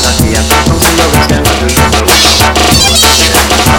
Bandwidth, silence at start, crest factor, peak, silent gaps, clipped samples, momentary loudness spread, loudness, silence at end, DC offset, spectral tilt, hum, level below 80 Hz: 19.5 kHz; 0 s; 6 dB; 0 dBFS; none; 0.7%; 4 LU; -6 LUFS; 0 s; under 0.1%; -3 dB/octave; none; -16 dBFS